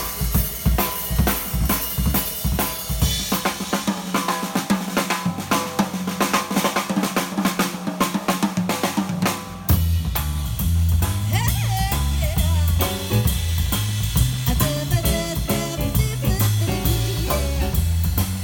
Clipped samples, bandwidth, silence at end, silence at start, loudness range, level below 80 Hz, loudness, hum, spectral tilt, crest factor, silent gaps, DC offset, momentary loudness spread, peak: under 0.1%; 17 kHz; 0 s; 0 s; 1 LU; -28 dBFS; -22 LUFS; none; -4.5 dB/octave; 16 dB; none; under 0.1%; 3 LU; -6 dBFS